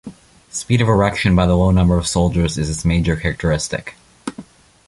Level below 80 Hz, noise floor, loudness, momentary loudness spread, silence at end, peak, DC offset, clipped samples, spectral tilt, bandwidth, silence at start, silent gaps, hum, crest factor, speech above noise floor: -28 dBFS; -40 dBFS; -17 LUFS; 17 LU; 0.45 s; -2 dBFS; under 0.1%; under 0.1%; -5.5 dB/octave; 11.5 kHz; 0.05 s; none; none; 16 dB; 24 dB